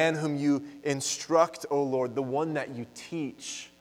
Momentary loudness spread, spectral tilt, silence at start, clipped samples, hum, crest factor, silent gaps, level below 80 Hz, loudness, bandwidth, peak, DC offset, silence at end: 13 LU; -4.5 dB/octave; 0 s; under 0.1%; none; 18 dB; none; -74 dBFS; -29 LUFS; 15.5 kHz; -10 dBFS; under 0.1%; 0.15 s